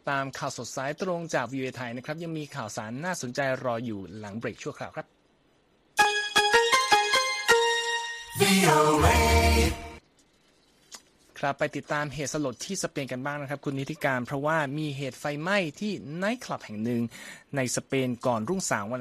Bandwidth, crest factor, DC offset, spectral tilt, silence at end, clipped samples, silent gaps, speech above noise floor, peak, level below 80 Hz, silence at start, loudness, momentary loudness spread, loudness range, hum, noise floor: 15 kHz; 22 dB; under 0.1%; -4 dB/octave; 0 s; under 0.1%; none; 37 dB; -6 dBFS; -40 dBFS; 0.05 s; -27 LUFS; 15 LU; 11 LU; none; -65 dBFS